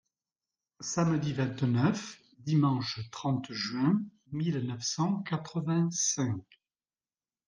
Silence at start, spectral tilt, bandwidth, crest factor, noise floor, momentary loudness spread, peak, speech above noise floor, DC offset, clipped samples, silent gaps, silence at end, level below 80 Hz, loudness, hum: 0.8 s; -5 dB/octave; 10.5 kHz; 20 dB; under -90 dBFS; 9 LU; -12 dBFS; over 60 dB; under 0.1%; under 0.1%; none; 1.05 s; -70 dBFS; -31 LUFS; none